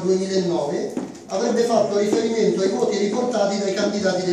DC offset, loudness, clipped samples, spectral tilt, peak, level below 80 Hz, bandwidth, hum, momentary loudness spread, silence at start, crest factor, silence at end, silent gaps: under 0.1%; -21 LUFS; under 0.1%; -5 dB/octave; -4 dBFS; -68 dBFS; 12 kHz; none; 6 LU; 0 s; 16 dB; 0 s; none